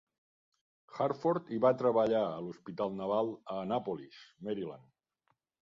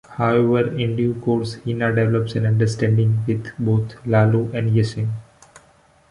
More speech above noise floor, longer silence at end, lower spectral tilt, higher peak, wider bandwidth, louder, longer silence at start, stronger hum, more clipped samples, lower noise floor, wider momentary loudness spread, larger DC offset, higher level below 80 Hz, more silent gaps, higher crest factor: first, 46 dB vs 36 dB; about the same, 1 s vs 0.9 s; about the same, -8 dB/octave vs -8 dB/octave; second, -14 dBFS vs -4 dBFS; second, 7.4 kHz vs 11 kHz; second, -34 LUFS vs -20 LUFS; first, 0.9 s vs 0.1 s; neither; neither; first, -79 dBFS vs -54 dBFS; first, 15 LU vs 6 LU; neither; second, -76 dBFS vs -50 dBFS; neither; about the same, 20 dB vs 16 dB